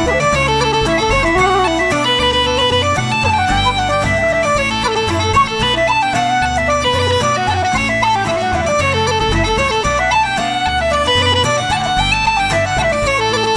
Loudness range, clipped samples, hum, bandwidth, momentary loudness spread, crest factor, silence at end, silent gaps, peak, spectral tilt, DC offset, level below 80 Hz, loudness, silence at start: 1 LU; under 0.1%; none; 11 kHz; 3 LU; 14 dB; 0 s; none; 0 dBFS; -3.5 dB/octave; under 0.1%; -30 dBFS; -14 LUFS; 0 s